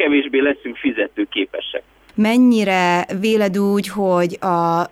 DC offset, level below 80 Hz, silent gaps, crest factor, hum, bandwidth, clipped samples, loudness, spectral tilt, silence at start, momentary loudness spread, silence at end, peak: under 0.1%; -58 dBFS; none; 12 dB; none; 15 kHz; under 0.1%; -17 LUFS; -5.5 dB/octave; 0 s; 9 LU; 0.05 s; -6 dBFS